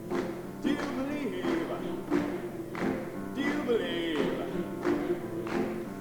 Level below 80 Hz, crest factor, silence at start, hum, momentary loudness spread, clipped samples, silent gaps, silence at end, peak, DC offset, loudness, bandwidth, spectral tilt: -56 dBFS; 16 dB; 0 s; none; 6 LU; under 0.1%; none; 0 s; -16 dBFS; under 0.1%; -32 LUFS; 19.5 kHz; -6 dB/octave